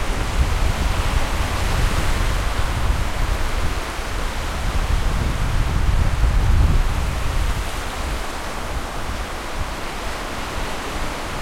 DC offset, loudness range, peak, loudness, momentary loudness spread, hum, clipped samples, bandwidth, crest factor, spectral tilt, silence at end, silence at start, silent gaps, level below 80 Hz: under 0.1%; 5 LU; -4 dBFS; -24 LUFS; 7 LU; none; under 0.1%; 16 kHz; 16 dB; -4.5 dB/octave; 0 s; 0 s; none; -22 dBFS